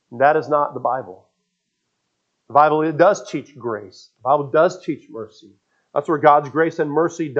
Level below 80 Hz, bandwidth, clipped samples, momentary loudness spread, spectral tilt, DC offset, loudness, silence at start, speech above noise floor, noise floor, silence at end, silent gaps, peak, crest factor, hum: -76 dBFS; 7.8 kHz; under 0.1%; 15 LU; -6 dB/octave; under 0.1%; -18 LUFS; 0.1 s; 56 dB; -74 dBFS; 0 s; none; 0 dBFS; 20 dB; none